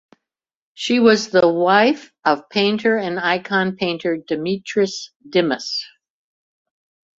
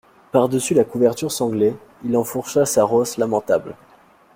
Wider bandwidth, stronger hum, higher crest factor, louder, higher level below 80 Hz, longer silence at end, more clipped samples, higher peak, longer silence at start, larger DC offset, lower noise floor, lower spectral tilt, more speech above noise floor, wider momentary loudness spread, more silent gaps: second, 7.8 kHz vs 16.5 kHz; neither; about the same, 18 dB vs 18 dB; about the same, -18 LUFS vs -19 LUFS; about the same, -62 dBFS vs -58 dBFS; first, 1.35 s vs 0.6 s; neither; about the same, -2 dBFS vs -2 dBFS; first, 0.8 s vs 0.35 s; neither; first, -83 dBFS vs -51 dBFS; about the same, -4.5 dB/octave vs -5 dB/octave; first, 65 dB vs 33 dB; first, 9 LU vs 5 LU; first, 5.16-5.20 s vs none